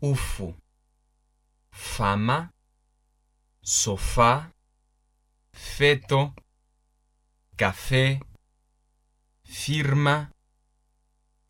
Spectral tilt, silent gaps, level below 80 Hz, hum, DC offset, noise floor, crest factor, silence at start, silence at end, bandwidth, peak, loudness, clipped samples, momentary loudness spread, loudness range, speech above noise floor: -4 dB/octave; none; -42 dBFS; 50 Hz at -50 dBFS; under 0.1%; -69 dBFS; 22 dB; 0 s; 1.2 s; 16.5 kHz; -6 dBFS; -24 LUFS; under 0.1%; 18 LU; 5 LU; 45 dB